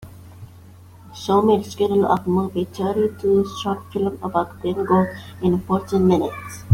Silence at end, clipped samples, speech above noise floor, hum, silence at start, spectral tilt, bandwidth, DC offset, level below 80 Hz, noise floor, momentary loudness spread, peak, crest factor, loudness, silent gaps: 0 s; under 0.1%; 24 dB; none; 0 s; -7.5 dB/octave; 16 kHz; under 0.1%; -52 dBFS; -44 dBFS; 8 LU; -2 dBFS; 18 dB; -21 LUFS; none